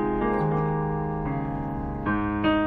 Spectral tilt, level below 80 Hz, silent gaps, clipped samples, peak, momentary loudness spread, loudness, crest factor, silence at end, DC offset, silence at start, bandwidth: -10 dB/octave; -38 dBFS; none; under 0.1%; -10 dBFS; 6 LU; -27 LUFS; 16 dB; 0 s; under 0.1%; 0 s; 4.7 kHz